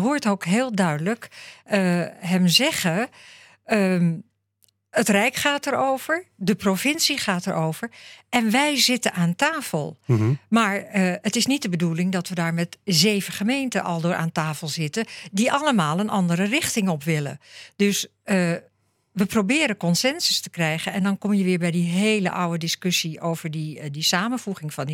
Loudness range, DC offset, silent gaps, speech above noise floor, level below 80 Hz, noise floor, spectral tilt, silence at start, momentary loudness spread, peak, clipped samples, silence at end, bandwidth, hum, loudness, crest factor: 2 LU; under 0.1%; none; 43 dB; -66 dBFS; -66 dBFS; -4.5 dB/octave; 0 s; 9 LU; -4 dBFS; under 0.1%; 0 s; 17 kHz; none; -22 LUFS; 20 dB